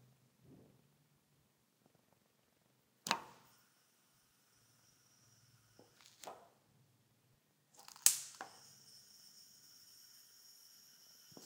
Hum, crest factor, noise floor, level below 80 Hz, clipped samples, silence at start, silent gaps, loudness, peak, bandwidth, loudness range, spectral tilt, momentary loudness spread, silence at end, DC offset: none; 46 dB; -76 dBFS; under -90 dBFS; under 0.1%; 0.5 s; none; -36 LUFS; -2 dBFS; 16 kHz; 22 LU; 0.5 dB/octave; 28 LU; 0 s; under 0.1%